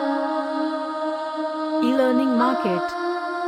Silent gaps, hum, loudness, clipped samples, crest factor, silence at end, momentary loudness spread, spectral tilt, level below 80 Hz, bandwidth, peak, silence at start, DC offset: none; none; -23 LUFS; under 0.1%; 16 dB; 0 s; 7 LU; -6 dB/octave; -68 dBFS; 13.5 kHz; -6 dBFS; 0 s; under 0.1%